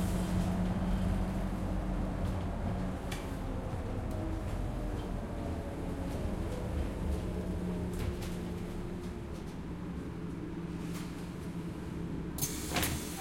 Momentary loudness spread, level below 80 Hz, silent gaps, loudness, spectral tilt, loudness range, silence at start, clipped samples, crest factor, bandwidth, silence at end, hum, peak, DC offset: 8 LU; -40 dBFS; none; -37 LUFS; -5.5 dB/octave; 5 LU; 0 s; under 0.1%; 18 dB; 16.5 kHz; 0 s; none; -18 dBFS; under 0.1%